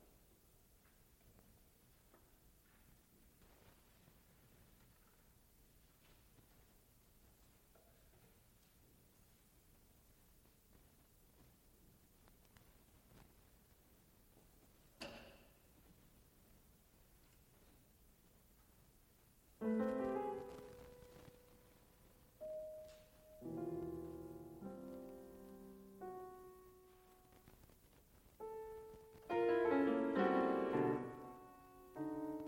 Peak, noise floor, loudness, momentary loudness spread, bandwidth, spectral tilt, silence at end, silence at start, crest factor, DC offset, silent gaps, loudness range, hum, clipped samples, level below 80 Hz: -24 dBFS; -70 dBFS; -43 LUFS; 31 LU; 16.5 kHz; -6.5 dB/octave; 0 s; 1.25 s; 24 dB; under 0.1%; none; 29 LU; none; under 0.1%; -72 dBFS